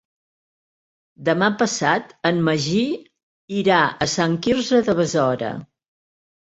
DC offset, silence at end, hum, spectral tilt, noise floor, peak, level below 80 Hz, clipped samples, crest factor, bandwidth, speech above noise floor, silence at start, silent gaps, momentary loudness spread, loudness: under 0.1%; 0.8 s; none; -4.5 dB/octave; under -90 dBFS; -2 dBFS; -56 dBFS; under 0.1%; 18 dB; 8.2 kHz; over 70 dB; 1.2 s; 3.23-3.48 s; 9 LU; -20 LUFS